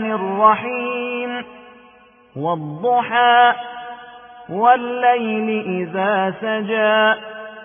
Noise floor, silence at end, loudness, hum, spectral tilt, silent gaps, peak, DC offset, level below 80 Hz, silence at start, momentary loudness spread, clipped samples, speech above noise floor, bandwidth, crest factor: -49 dBFS; 0 s; -18 LUFS; none; -10 dB/octave; none; -2 dBFS; under 0.1%; -64 dBFS; 0 s; 17 LU; under 0.1%; 32 dB; 3.6 kHz; 18 dB